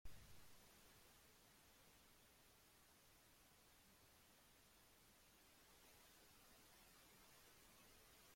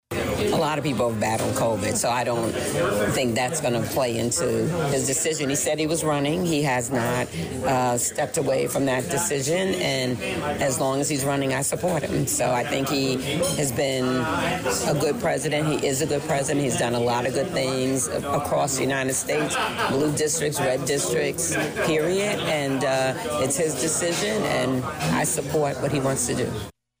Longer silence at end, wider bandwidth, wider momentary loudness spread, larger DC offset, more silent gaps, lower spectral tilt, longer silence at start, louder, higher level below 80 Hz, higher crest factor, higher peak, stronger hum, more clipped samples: second, 0 s vs 0.3 s; about the same, 16.5 kHz vs 16 kHz; about the same, 2 LU vs 2 LU; neither; neither; second, -2.5 dB/octave vs -4 dB/octave; about the same, 0.05 s vs 0.1 s; second, -68 LUFS vs -23 LUFS; second, -78 dBFS vs -50 dBFS; first, 24 dB vs 10 dB; second, -44 dBFS vs -14 dBFS; neither; neither